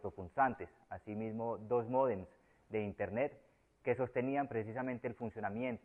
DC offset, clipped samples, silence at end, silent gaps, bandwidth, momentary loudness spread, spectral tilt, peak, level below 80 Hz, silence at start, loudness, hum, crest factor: under 0.1%; under 0.1%; 0.05 s; none; 3.5 kHz; 10 LU; -9.5 dB/octave; -20 dBFS; -70 dBFS; 0 s; -39 LUFS; none; 20 dB